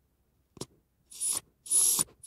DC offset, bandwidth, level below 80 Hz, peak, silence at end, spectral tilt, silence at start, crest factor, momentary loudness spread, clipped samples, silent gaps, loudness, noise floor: under 0.1%; 16 kHz; -70 dBFS; -12 dBFS; 0 s; 0 dB/octave; 0.6 s; 20 dB; 24 LU; under 0.1%; none; -26 LUFS; -72 dBFS